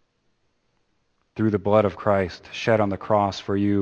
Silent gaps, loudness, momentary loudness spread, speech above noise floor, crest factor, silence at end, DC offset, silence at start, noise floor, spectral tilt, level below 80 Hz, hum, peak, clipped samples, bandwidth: none; -23 LUFS; 7 LU; 47 dB; 20 dB; 0 s; under 0.1%; 1.35 s; -69 dBFS; -7 dB/octave; -56 dBFS; none; -4 dBFS; under 0.1%; 8.2 kHz